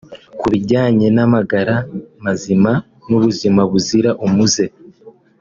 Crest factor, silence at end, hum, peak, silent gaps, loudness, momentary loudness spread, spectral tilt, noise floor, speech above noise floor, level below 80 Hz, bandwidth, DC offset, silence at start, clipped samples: 14 dB; 0.3 s; none; -2 dBFS; none; -15 LUFS; 9 LU; -5.5 dB/octave; -44 dBFS; 30 dB; -50 dBFS; 7.6 kHz; under 0.1%; 0.1 s; under 0.1%